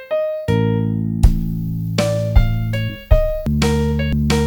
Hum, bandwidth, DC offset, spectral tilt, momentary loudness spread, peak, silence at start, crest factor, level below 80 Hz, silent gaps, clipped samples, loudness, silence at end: none; 19 kHz; under 0.1%; -6.5 dB/octave; 5 LU; 0 dBFS; 0 s; 16 dB; -22 dBFS; none; under 0.1%; -19 LUFS; 0 s